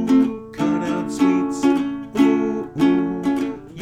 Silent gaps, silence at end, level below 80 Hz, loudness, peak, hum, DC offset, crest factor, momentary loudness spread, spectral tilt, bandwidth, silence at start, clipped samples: none; 0 s; -52 dBFS; -20 LUFS; -4 dBFS; none; under 0.1%; 16 dB; 7 LU; -6.5 dB/octave; 10.5 kHz; 0 s; under 0.1%